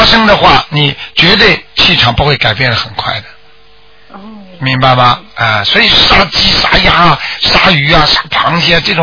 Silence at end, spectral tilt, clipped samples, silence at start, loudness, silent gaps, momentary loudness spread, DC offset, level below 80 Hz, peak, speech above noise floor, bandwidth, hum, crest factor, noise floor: 0 s; -4.5 dB/octave; 2%; 0 s; -7 LUFS; none; 7 LU; under 0.1%; -26 dBFS; 0 dBFS; 35 dB; 5.4 kHz; none; 8 dB; -43 dBFS